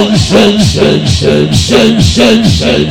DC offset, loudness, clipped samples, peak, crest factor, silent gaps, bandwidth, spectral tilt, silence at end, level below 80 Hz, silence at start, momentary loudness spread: under 0.1%; -7 LUFS; 5%; 0 dBFS; 6 dB; none; 16.5 kHz; -5 dB/octave; 0 s; -26 dBFS; 0 s; 3 LU